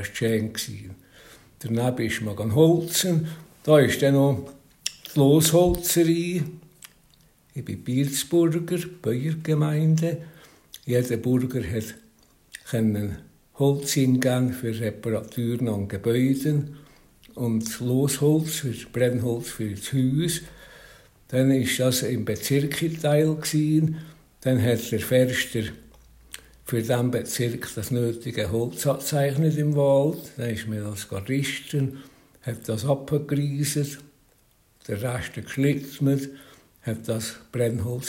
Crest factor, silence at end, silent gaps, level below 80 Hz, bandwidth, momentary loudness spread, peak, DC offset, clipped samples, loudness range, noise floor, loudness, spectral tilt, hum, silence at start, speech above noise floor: 22 dB; 0 s; none; -52 dBFS; 16.5 kHz; 14 LU; -2 dBFS; under 0.1%; under 0.1%; 6 LU; -61 dBFS; -24 LUFS; -5.5 dB/octave; none; 0 s; 38 dB